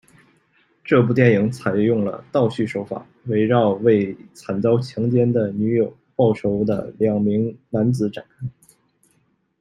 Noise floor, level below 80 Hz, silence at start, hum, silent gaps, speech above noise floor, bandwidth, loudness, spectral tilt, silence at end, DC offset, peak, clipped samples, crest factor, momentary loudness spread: -64 dBFS; -58 dBFS; 0.85 s; none; none; 45 dB; 11.5 kHz; -20 LUFS; -8.5 dB/octave; 1.1 s; under 0.1%; -2 dBFS; under 0.1%; 18 dB; 12 LU